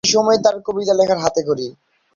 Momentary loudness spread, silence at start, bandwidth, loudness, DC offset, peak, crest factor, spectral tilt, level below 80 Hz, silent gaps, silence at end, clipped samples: 9 LU; 0.05 s; 7.6 kHz; -17 LUFS; under 0.1%; -2 dBFS; 16 dB; -3 dB/octave; -56 dBFS; none; 0.45 s; under 0.1%